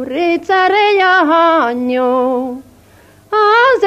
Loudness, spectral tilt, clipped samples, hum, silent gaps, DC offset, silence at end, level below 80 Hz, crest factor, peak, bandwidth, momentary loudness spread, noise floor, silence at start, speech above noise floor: -12 LUFS; -4 dB/octave; under 0.1%; none; none; under 0.1%; 0 s; -56 dBFS; 12 dB; 0 dBFS; 14 kHz; 9 LU; -44 dBFS; 0 s; 33 dB